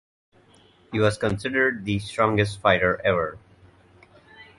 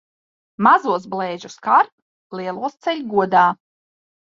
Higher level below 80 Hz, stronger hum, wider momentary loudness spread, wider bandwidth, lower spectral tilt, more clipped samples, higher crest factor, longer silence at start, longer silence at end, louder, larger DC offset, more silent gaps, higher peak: first, -50 dBFS vs -68 dBFS; neither; second, 7 LU vs 13 LU; first, 11.5 kHz vs 7.6 kHz; about the same, -6 dB/octave vs -5.5 dB/octave; neither; about the same, 20 dB vs 18 dB; first, 0.9 s vs 0.6 s; second, 0.15 s vs 0.7 s; second, -23 LUFS vs -19 LUFS; neither; second, none vs 1.92-2.30 s; about the same, -4 dBFS vs -2 dBFS